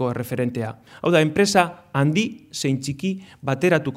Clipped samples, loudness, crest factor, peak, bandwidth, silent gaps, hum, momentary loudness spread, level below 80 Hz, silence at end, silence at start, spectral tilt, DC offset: under 0.1%; -22 LUFS; 20 dB; -2 dBFS; 16 kHz; none; none; 10 LU; -58 dBFS; 0 s; 0 s; -5.5 dB/octave; under 0.1%